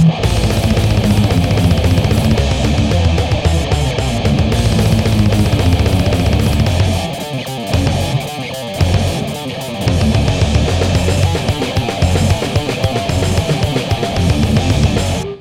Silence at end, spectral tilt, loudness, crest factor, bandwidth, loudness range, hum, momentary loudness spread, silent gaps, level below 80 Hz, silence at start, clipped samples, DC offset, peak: 0 s; -6 dB/octave; -15 LUFS; 12 dB; 16.5 kHz; 3 LU; none; 5 LU; none; -22 dBFS; 0 s; under 0.1%; under 0.1%; 0 dBFS